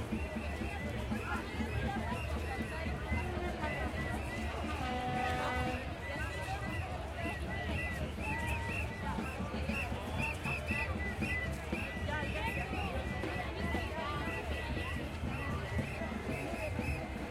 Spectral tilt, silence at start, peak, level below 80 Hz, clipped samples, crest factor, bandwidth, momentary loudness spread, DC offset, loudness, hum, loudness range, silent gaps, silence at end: -6 dB/octave; 0 s; -22 dBFS; -44 dBFS; under 0.1%; 16 dB; 15.5 kHz; 4 LU; under 0.1%; -38 LUFS; none; 1 LU; none; 0 s